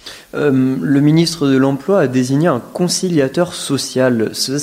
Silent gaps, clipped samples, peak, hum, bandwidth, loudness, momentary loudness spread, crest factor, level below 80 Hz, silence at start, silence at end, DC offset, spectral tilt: none; under 0.1%; -2 dBFS; none; 16 kHz; -15 LUFS; 5 LU; 12 dB; -54 dBFS; 0.05 s; 0 s; under 0.1%; -5.5 dB/octave